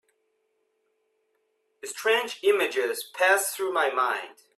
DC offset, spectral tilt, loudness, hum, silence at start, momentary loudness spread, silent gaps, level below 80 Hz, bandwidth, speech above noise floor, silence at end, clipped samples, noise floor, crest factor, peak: under 0.1%; 0 dB/octave; -25 LUFS; none; 1.85 s; 9 LU; none; -80 dBFS; 15 kHz; 48 dB; 0.25 s; under 0.1%; -73 dBFS; 20 dB; -8 dBFS